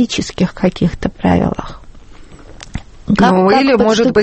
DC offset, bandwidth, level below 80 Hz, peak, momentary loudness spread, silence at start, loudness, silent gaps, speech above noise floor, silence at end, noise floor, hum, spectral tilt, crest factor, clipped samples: under 0.1%; 8.6 kHz; -34 dBFS; 0 dBFS; 20 LU; 0 s; -13 LUFS; none; 23 dB; 0 s; -35 dBFS; none; -6 dB/octave; 14 dB; under 0.1%